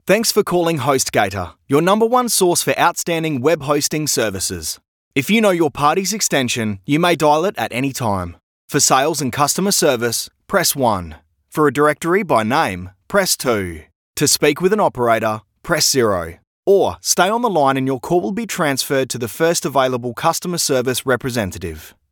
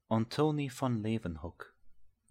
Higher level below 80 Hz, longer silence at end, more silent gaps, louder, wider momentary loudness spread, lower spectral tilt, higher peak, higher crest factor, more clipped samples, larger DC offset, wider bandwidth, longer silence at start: first, -48 dBFS vs -58 dBFS; about the same, 0.2 s vs 0.25 s; first, 4.88-5.11 s, 8.43-8.68 s, 13.95-14.14 s, 16.47-16.63 s vs none; first, -17 LUFS vs -34 LUFS; second, 9 LU vs 18 LU; second, -3.5 dB/octave vs -7 dB/octave; first, 0 dBFS vs -16 dBFS; about the same, 18 dB vs 18 dB; neither; neither; first, 19 kHz vs 15.5 kHz; about the same, 0.05 s vs 0.1 s